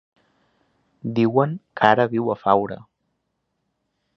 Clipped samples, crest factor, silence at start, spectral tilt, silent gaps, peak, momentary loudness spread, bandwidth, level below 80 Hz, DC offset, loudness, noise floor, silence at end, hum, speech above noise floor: under 0.1%; 22 dB; 1.05 s; -8 dB/octave; none; 0 dBFS; 14 LU; 6.8 kHz; -64 dBFS; under 0.1%; -20 LUFS; -75 dBFS; 1.4 s; none; 55 dB